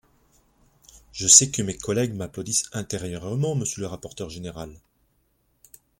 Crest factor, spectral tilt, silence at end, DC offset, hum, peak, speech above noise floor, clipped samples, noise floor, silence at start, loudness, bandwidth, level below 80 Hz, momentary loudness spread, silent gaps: 26 dB; -3 dB/octave; 1.25 s; under 0.1%; none; 0 dBFS; 44 dB; under 0.1%; -68 dBFS; 0.95 s; -21 LUFS; 16.5 kHz; -54 dBFS; 22 LU; none